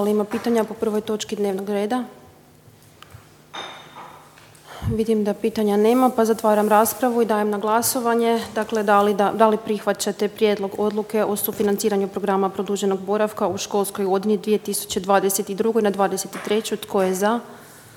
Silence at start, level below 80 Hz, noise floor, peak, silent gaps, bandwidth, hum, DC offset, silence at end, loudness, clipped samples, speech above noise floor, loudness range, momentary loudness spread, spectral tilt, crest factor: 0 s; -54 dBFS; -50 dBFS; -2 dBFS; none; 18 kHz; none; under 0.1%; 0.15 s; -21 LUFS; under 0.1%; 29 dB; 9 LU; 9 LU; -4.5 dB/octave; 20 dB